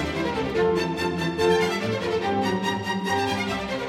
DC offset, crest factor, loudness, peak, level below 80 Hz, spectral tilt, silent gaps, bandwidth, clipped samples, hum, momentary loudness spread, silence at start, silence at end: under 0.1%; 16 dB; -24 LUFS; -8 dBFS; -48 dBFS; -5 dB/octave; none; 16 kHz; under 0.1%; none; 5 LU; 0 s; 0 s